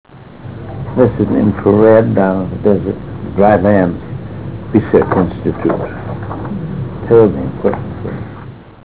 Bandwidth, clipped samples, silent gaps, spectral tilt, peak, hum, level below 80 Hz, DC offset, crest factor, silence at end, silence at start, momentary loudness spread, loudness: 4 kHz; under 0.1%; none; -12.5 dB/octave; 0 dBFS; none; -34 dBFS; 0.9%; 14 dB; 0.05 s; 0.1 s; 17 LU; -13 LUFS